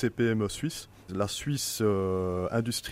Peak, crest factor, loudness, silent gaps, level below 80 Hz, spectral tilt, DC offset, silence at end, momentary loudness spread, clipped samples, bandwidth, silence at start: -14 dBFS; 14 dB; -30 LUFS; none; -54 dBFS; -5 dB/octave; under 0.1%; 0 s; 8 LU; under 0.1%; 16 kHz; 0 s